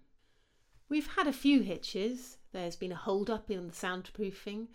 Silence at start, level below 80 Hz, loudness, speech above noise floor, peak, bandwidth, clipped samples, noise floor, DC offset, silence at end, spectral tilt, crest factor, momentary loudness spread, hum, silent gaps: 0.9 s; -58 dBFS; -34 LUFS; 35 dB; -16 dBFS; 16.5 kHz; under 0.1%; -69 dBFS; under 0.1%; 0.05 s; -5 dB/octave; 18 dB; 13 LU; none; none